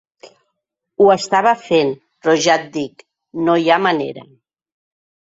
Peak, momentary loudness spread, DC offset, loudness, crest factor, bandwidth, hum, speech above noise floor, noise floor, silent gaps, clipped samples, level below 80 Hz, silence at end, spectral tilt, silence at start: -2 dBFS; 15 LU; under 0.1%; -16 LUFS; 16 dB; 8 kHz; none; 60 dB; -76 dBFS; none; under 0.1%; -62 dBFS; 1.1 s; -4 dB/octave; 1 s